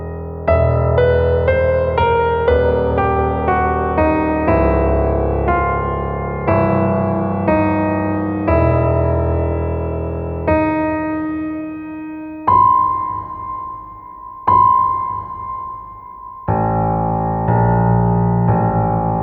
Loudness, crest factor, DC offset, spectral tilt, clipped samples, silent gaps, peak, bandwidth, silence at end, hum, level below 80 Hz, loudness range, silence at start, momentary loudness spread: -16 LUFS; 14 dB; under 0.1%; -11.5 dB/octave; under 0.1%; none; -2 dBFS; 4.9 kHz; 0 s; none; -28 dBFS; 4 LU; 0 s; 12 LU